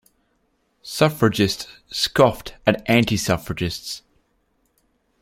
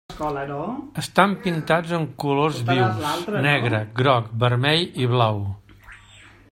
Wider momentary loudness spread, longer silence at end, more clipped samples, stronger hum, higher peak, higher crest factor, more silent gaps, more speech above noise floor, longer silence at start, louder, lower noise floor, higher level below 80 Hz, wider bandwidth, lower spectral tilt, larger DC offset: first, 14 LU vs 10 LU; first, 1.25 s vs 0.25 s; neither; neither; about the same, -2 dBFS vs 0 dBFS; about the same, 22 dB vs 22 dB; neither; first, 47 dB vs 27 dB; first, 0.85 s vs 0.1 s; about the same, -21 LUFS vs -22 LUFS; first, -67 dBFS vs -48 dBFS; first, -48 dBFS vs -54 dBFS; about the same, 16.5 kHz vs 16 kHz; about the same, -5 dB/octave vs -6 dB/octave; neither